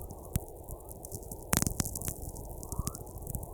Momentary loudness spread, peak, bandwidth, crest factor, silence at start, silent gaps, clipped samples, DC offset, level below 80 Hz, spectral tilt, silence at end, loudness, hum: 14 LU; -2 dBFS; 19.5 kHz; 34 dB; 0 s; none; under 0.1%; under 0.1%; -44 dBFS; -4 dB/octave; 0 s; -37 LUFS; none